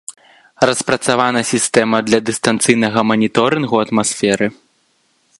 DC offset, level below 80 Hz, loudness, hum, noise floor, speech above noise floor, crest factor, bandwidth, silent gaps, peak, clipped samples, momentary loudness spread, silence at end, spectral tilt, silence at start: under 0.1%; -56 dBFS; -15 LUFS; none; -60 dBFS; 45 dB; 16 dB; 11.5 kHz; none; 0 dBFS; under 0.1%; 3 LU; 0.85 s; -3.5 dB/octave; 0.1 s